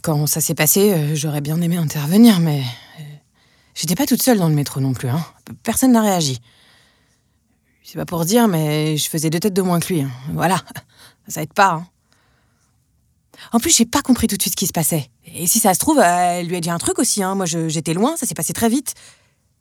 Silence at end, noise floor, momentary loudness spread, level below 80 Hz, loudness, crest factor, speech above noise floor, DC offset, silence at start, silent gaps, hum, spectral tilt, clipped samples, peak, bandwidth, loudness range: 0.65 s; -62 dBFS; 14 LU; -52 dBFS; -17 LUFS; 18 dB; 45 dB; under 0.1%; 0.05 s; none; none; -4.5 dB/octave; under 0.1%; 0 dBFS; 19.5 kHz; 5 LU